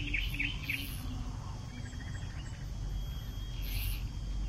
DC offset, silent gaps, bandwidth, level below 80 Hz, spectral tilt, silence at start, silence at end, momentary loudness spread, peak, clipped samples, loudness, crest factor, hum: under 0.1%; none; 16 kHz; -40 dBFS; -4 dB/octave; 0 s; 0 s; 8 LU; -20 dBFS; under 0.1%; -39 LUFS; 18 dB; none